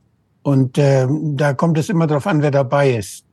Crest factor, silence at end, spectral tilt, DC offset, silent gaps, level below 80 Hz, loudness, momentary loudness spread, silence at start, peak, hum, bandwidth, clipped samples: 14 dB; 0.15 s; -7.5 dB/octave; under 0.1%; none; -62 dBFS; -17 LUFS; 4 LU; 0.45 s; -2 dBFS; none; 12.5 kHz; under 0.1%